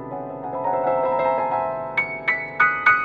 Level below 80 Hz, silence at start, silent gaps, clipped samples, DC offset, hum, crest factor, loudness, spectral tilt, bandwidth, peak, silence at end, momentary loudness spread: -58 dBFS; 0 s; none; under 0.1%; under 0.1%; none; 18 dB; -21 LUFS; -6.5 dB/octave; 7.2 kHz; -4 dBFS; 0 s; 11 LU